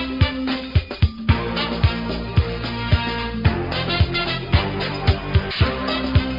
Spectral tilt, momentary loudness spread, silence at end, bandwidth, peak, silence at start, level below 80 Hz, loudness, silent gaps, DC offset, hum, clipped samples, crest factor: -8 dB/octave; 4 LU; 0 s; 5.4 kHz; -4 dBFS; 0 s; -28 dBFS; -21 LUFS; none; under 0.1%; none; under 0.1%; 18 dB